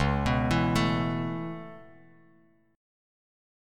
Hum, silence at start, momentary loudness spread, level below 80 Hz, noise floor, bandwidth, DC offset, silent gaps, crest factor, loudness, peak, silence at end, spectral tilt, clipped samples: none; 0 s; 15 LU; -42 dBFS; -63 dBFS; 15 kHz; under 0.1%; none; 18 dB; -28 LUFS; -12 dBFS; 0.95 s; -6.5 dB/octave; under 0.1%